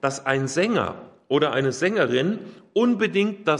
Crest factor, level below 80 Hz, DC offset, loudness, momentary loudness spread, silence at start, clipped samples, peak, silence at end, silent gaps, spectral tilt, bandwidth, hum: 18 dB; -68 dBFS; under 0.1%; -23 LUFS; 7 LU; 0.05 s; under 0.1%; -4 dBFS; 0 s; none; -5 dB/octave; 11.5 kHz; none